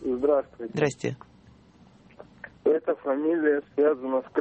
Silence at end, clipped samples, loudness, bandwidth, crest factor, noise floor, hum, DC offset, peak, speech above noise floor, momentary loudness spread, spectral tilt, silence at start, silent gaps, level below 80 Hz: 0 s; under 0.1%; -26 LUFS; 8.4 kHz; 18 dB; -55 dBFS; none; under 0.1%; -10 dBFS; 29 dB; 11 LU; -6.5 dB/octave; 0 s; none; -62 dBFS